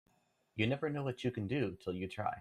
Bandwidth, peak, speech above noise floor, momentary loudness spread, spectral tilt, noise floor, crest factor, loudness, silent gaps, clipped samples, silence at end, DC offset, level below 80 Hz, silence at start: 12.5 kHz; -18 dBFS; 36 dB; 6 LU; -7 dB/octave; -73 dBFS; 20 dB; -38 LUFS; none; under 0.1%; 0 s; under 0.1%; -68 dBFS; 0.55 s